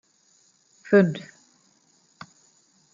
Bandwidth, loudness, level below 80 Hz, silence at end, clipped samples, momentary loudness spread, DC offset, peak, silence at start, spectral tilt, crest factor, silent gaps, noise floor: 7.6 kHz; -21 LUFS; -74 dBFS; 1.75 s; under 0.1%; 28 LU; under 0.1%; -4 dBFS; 0.9 s; -7.5 dB/octave; 22 dB; none; -63 dBFS